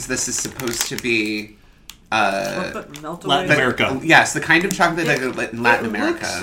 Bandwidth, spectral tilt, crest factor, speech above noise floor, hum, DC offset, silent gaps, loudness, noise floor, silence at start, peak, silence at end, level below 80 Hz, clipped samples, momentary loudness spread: 17 kHz; -3 dB/octave; 20 dB; 25 dB; none; under 0.1%; none; -18 LUFS; -45 dBFS; 0 s; 0 dBFS; 0 s; -48 dBFS; under 0.1%; 12 LU